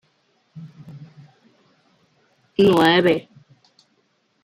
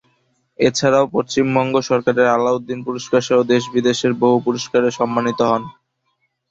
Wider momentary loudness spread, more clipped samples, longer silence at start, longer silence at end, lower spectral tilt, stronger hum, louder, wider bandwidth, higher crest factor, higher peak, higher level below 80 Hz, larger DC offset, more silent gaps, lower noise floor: first, 27 LU vs 4 LU; neither; about the same, 0.55 s vs 0.6 s; first, 1.25 s vs 0.8 s; about the same, -6 dB/octave vs -5 dB/octave; neither; about the same, -17 LUFS vs -17 LUFS; first, 15.5 kHz vs 8.2 kHz; about the same, 20 dB vs 16 dB; about the same, -4 dBFS vs -2 dBFS; second, -62 dBFS vs -56 dBFS; neither; neither; about the same, -66 dBFS vs -69 dBFS